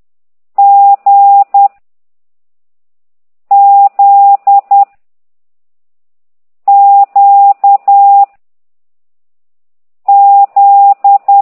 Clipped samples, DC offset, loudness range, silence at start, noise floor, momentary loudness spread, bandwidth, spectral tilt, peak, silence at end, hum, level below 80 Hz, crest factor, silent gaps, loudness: under 0.1%; under 0.1%; 2 LU; 0.6 s; under -90 dBFS; 5 LU; 2.5 kHz; -5.5 dB/octave; 0 dBFS; 0 s; none; -78 dBFS; 8 dB; none; -6 LUFS